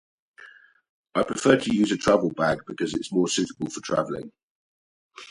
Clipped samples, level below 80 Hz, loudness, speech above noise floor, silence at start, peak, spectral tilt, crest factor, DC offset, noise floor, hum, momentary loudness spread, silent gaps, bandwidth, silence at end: under 0.1%; -56 dBFS; -24 LUFS; 27 dB; 0.4 s; -4 dBFS; -4.5 dB/octave; 22 dB; under 0.1%; -51 dBFS; none; 12 LU; 0.89-1.04 s, 4.43-5.10 s; 11.5 kHz; 0 s